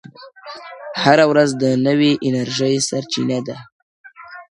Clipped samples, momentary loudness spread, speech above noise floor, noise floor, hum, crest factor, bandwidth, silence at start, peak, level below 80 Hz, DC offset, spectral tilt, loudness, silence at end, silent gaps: under 0.1%; 23 LU; 21 dB; -37 dBFS; none; 18 dB; 11.5 kHz; 0.2 s; 0 dBFS; -62 dBFS; under 0.1%; -4.5 dB/octave; -16 LUFS; 0.1 s; 3.72-4.04 s